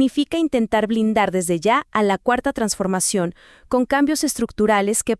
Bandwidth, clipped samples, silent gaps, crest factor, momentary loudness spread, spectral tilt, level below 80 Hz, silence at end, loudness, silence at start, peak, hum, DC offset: 12 kHz; under 0.1%; none; 16 dB; 4 LU; -4 dB/octave; -48 dBFS; 0.05 s; -19 LUFS; 0 s; -4 dBFS; none; under 0.1%